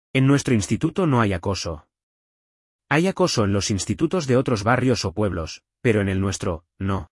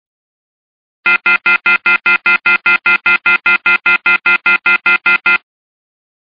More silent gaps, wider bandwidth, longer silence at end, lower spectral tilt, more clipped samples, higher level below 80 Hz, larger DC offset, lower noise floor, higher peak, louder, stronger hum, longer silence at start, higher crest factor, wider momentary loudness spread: first, 2.03-2.79 s vs none; first, 12 kHz vs 6.8 kHz; second, 0.1 s vs 0.95 s; first, -5.5 dB/octave vs -3.5 dB/octave; neither; first, -48 dBFS vs -54 dBFS; neither; about the same, under -90 dBFS vs under -90 dBFS; second, -6 dBFS vs -2 dBFS; second, -22 LUFS vs -10 LUFS; neither; second, 0.15 s vs 1.05 s; about the same, 16 dB vs 12 dB; first, 9 LU vs 1 LU